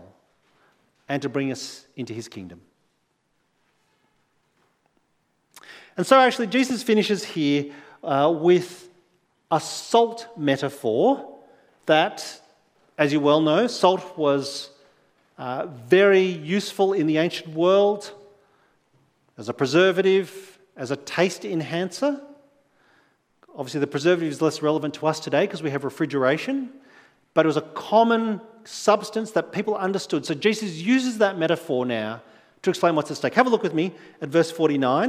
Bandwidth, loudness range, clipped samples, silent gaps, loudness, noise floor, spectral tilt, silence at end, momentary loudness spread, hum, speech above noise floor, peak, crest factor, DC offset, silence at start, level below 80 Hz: 15.5 kHz; 6 LU; under 0.1%; none; -22 LUFS; -70 dBFS; -5 dB/octave; 0 s; 16 LU; none; 49 dB; 0 dBFS; 24 dB; under 0.1%; 1.1 s; -76 dBFS